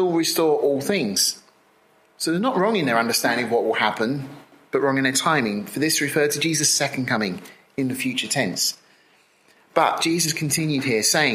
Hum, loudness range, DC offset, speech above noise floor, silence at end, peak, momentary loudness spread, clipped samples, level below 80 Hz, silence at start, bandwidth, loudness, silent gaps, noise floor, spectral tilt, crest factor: none; 3 LU; under 0.1%; 37 dB; 0 s; -2 dBFS; 8 LU; under 0.1%; -68 dBFS; 0 s; 16 kHz; -21 LUFS; none; -58 dBFS; -3 dB/octave; 20 dB